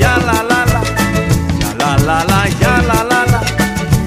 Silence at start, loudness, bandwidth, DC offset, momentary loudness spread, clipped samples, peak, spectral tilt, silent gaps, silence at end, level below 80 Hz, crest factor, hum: 0 s; -13 LUFS; 15.5 kHz; under 0.1%; 3 LU; under 0.1%; 0 dBFS; -5 dB/octave; none; 0 s; -24 dBFS; 12 dB; none